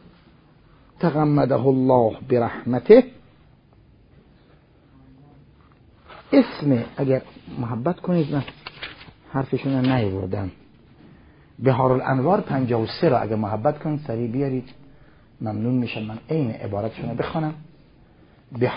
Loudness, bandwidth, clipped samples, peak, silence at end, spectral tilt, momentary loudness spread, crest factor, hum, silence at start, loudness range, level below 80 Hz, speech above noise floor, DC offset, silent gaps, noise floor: -22 LUFS; 5.4 kHz; under 0.1%; 0 dBFS; 0 s; -12.5 dB/octave; 12 LU; 22 dB; none; 1 s; 8 LU; -52 dBFS; 33 dB; under 0.1%; none; -54 dBFS